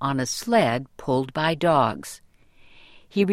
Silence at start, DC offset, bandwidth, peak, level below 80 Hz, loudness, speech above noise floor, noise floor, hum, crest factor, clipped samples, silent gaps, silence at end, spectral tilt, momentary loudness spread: 0 s; under 0.1%; 16 kHz; -6 dBFS; -56 dBFS; -23 LUFS; 29 dB; -52 dBFS; none; 18 dB; under 0.1%; none; 0 s; -5 dB/octave; 14 LU